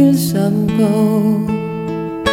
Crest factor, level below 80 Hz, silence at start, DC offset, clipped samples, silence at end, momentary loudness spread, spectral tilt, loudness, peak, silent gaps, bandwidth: 14 dB; -42 dBFS; 0 s; under 0.1%; under 0.1%; 0 s; 9 LU; -6.5 dB/octave; -16 LUFS; 0 dBFS; none; 17 kHz